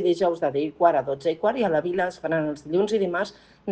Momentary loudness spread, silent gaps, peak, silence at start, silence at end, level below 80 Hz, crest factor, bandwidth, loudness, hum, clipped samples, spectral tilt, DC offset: 6 LU; none; -6 dBFS; 0 s; 0 s; -62 dBFS; 18 dB; 9 kHz; -24 LUFS; none; under 0.1%; -6.5 dB/octave; under 0.1%